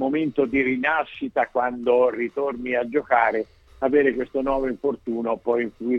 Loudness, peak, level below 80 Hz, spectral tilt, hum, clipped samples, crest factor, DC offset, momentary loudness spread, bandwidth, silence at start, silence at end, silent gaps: -23 LUFS; -6 dBFS; -50 dBFS; -7.5 dB/octave; none; under 0.1%; 16 dB; under 0.1%; 7 LU; 6 kHz; 0 s; 0 s; none